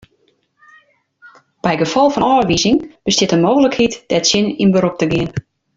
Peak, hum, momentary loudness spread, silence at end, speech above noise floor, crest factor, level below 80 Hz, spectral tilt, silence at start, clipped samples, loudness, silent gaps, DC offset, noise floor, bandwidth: 0 dBFS; none; 6 LU; 0.35 s; 46 dB; 16 dB; -46 dBFS; -4.5 dB/octave; 1.25 s; under 0.1%; -15 LUFS; none; under 0.1%; -60 dBFS; 7.8 kHz